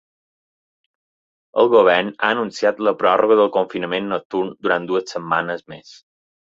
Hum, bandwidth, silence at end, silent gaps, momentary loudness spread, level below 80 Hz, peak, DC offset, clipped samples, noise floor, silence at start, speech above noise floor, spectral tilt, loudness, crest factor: none; 7.8 kHz; 0.8 s; 4.25-4.30 s; 11 LU; -64 dBFS; -2 dBFS; under 0.1%; under 0.1%; under -90 dBFS; 1.55 s; over 72 dB; -5 dB/octave; -18 LUFS; 18 dB